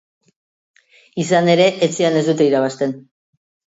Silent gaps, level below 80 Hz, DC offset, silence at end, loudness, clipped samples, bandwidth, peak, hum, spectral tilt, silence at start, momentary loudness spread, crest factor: none; -66 dBFS; under 0.1%; 0.8 s; -16 LUFS; under 0.1%; 8 kHz; -2 dBFS; none; -5 dB/octave; 1.15 s; 11 LU; 18 dB